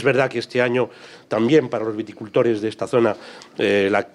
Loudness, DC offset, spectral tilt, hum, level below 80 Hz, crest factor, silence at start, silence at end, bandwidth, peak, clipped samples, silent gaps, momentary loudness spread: -20 LUFS; under 0.1%; -6 dB/octave; none; -68 dBFS; 16 dB; 0 s; 0.05 s; 11.5 kHz; -4 dBFS; under 0.1%; none; 10 LU